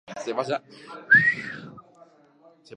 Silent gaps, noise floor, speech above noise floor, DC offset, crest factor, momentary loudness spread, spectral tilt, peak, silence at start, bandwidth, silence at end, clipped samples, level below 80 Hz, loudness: none; -56 dBFS; 33 dB; under 0.1%; 20 dB; 24 LU; -4.5 dB/octave; -6 dBFS; 0.1 s; 10 kHz; 0 s; under 0.1%; -68 dBFS; -21 LUFS